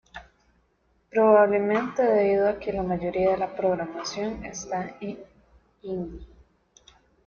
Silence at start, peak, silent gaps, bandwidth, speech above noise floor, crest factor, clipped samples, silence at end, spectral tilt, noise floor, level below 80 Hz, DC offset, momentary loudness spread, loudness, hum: 0.15 s; -6 dBFS; none; 7 kHz; 43 dB; 20 dB; under 0.1%; 1 s; -5.5 dB/octave; -67 dBFS; -52 dBFS; under 0.1%; 19 LU; -25 LUFS; none